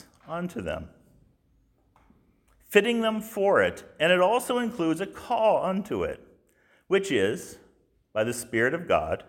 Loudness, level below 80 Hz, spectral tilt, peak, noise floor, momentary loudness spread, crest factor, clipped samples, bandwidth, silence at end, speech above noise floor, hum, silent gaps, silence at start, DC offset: -26 LUFS; -56 dBFS; -4.5 dB/octave; -4 dBFS; -66 dBFS; 13 LU; 22 dB; under 0.1%; 17 kHz; 0.05 s; 40 dB; none; none; 0.25 s; under 0.1%